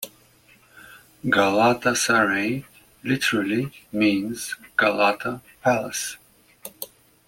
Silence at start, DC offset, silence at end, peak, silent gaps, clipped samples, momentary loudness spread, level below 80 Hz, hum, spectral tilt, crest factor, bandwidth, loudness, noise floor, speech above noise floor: 0 s; under 0.1%; 0.4 s; -4 dBFS; none; under 0.1%; 18 LU; -60 dBFS; none; -3.5 dB/octave; 20 dB; 16.5 kHz; -22 LUFS; -56 dBFS; 33 dB